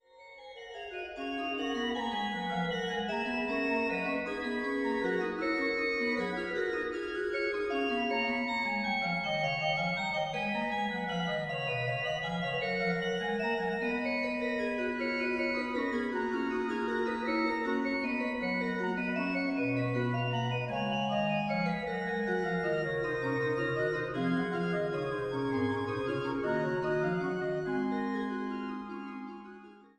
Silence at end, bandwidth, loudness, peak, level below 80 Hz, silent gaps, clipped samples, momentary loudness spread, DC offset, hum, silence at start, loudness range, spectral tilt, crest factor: 0.15 s; 10.5 kHz; -32 LUFS; -18 dBFS; -62 dBFS; none; under 0.1%; 4 LU; under 0.1%; none; 0.15 s; 1 LU; -6.5 dB/octave; 14 dB